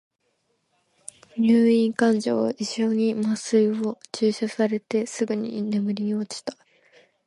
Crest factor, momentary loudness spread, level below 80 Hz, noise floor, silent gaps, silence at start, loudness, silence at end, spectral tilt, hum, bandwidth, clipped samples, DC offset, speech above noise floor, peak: 16 dB; 13 LU; -70 dBFS; -72 dBFS; none; 1.35 s; -23 LUFS; 0.75 s; -5.5 dB/octave; none; 11.5 kHz; under 0.1%; under 0.1%; 49 dB; -8 dBFS